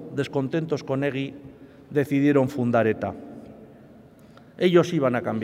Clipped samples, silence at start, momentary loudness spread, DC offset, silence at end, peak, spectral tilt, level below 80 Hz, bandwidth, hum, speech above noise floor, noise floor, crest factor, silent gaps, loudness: under 0.1%; 0 s; 15 LU; under 0.1%; 0 s; -6 dBFS; -7.5 dB/octave; -64 dBFS; 15 kHz; none; 27 dB; -50 dBFS; 20 dB; none; -24 LUFS